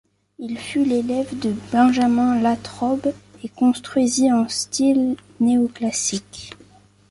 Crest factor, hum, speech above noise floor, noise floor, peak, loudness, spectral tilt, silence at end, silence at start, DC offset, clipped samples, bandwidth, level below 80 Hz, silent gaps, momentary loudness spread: 14 dB; 50 Hz at -45 dBFS; 31 dB; -51 dBFS; -6 dBFS; -20 LUFS; -4 dB/octave; 0.6 s; 0.4 s; under 0.1%; under 0.1%; 11.5 kHz; -56 dBFS; none; 14 LU